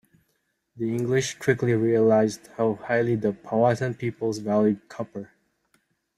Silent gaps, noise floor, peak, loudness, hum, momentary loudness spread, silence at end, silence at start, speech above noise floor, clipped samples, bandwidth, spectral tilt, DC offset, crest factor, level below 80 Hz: none; -74 dBFS; -6 dBFS; -24 LUFS; none; 11 LU; 0.95 s; 0.75 s; 50 dB; under 0.1%; 13 kHz; -6.5 dB/octave; under 0.1%; 18 dB; -64 dBFS